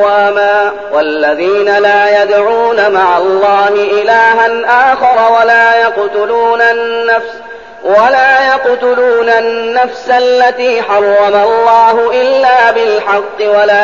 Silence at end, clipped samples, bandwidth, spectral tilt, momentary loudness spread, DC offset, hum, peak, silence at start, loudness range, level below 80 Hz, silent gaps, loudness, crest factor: 0 s; 0.3%; 7.4 kHz; -3.5 dB/octave; 6 LU; 0.6%; none; 0 dBFS; 0 s; 2 LU; -52 dBFS; none; -8 LUFS; 8 dB